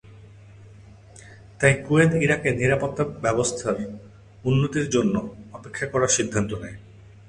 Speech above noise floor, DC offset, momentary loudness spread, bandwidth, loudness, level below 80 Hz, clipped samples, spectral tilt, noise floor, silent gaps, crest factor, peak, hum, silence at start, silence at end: 24 dB; under 0.1%; 17 LU; 11 kHz; -23 LUFS; -50 dBFS; under 0.1%; -5 dB/octave; -47 dBFS; none; 22 dB; -2 dBFS; none; 0.05 s; 0.3 s